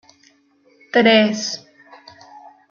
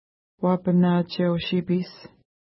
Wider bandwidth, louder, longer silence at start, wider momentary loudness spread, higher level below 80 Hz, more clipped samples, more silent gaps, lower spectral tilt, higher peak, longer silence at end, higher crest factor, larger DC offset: first, 7.2 kHz vs 5.8 kHz; first, -16 LUFS vs -23 LUFS; first, 0.95 s vs 0.4 s; first, 14 LU vs 7 LU; second, -68 dBFS vs -60 dBFS; neither; neither; second, -3.5 dB/octave vs -11 dB/octave; first, -2 dBFS vs -10 dBFS; about the same, 0.35 s vs 0.4 s; about the same, 18 dB vs 14 dB; neither